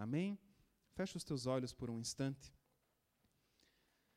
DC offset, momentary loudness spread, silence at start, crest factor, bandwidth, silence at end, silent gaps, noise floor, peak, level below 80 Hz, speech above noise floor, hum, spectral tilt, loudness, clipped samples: under 0.1%; 13 LU; 0 s; 18 dB; 15.5 kHz; 1.65 s; none; -83 dBFS; -28 dBFS; -72 dBFS; 40 dB; none; -5.5 dB/octave; -44 LUFS; under 0.1%